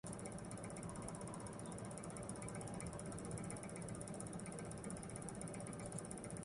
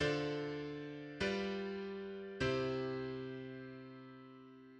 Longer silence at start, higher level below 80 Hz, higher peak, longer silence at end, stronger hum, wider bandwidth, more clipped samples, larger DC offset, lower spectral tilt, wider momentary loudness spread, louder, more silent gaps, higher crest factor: about the same, 0.05 s vs 0 s; about the same, -64 dBFS vs -64 dBFS; second, -28 dBFS vs -24 dBFS; about the same, 0 s vs 0 s; neither; first, 11.5 kHz vs 9.4 kHz; neither; neither; about the same, -5 dB/octave vs -6 dB/octave; second, 2 LU vs 17 LU; second, -49 LUFS vs -41 LUFS; neither; about the same, 20 dB vs 18 dB